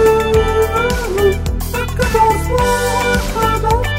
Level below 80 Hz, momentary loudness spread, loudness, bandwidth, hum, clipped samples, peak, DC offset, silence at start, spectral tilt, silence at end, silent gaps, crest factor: -22 dBFS; 6 LU; -15 LUFS; 16.5 kHz; none; under 0.1%; 0 dBFS; under 0.1%; 0 s; -5 dB/octave; 0 s; none; 14 dB